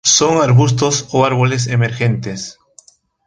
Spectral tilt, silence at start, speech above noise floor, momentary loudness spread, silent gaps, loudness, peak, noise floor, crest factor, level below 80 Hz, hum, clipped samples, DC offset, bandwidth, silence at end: -4 dB/octave; 0.05 s; 34 dB; 13 LU; none; -14 LUFS; 0 dBFS; -48 dBFS; 14 dB; -48 dBFS; none; under 0.1%; under 0.1%; 10 kHz; 0.75 s